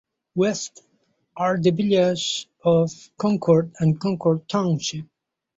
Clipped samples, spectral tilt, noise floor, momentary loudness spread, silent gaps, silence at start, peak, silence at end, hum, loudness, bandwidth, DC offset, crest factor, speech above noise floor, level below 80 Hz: under 0.1%; -6 dB/octave; -54 dBFS; 9 LU; none; 0.35 s; -6 dBFS; 0.55 s; none; -22 LUFS; 8 kHz; under 0.1%; 16 dB; 33 dB; -62 dBFS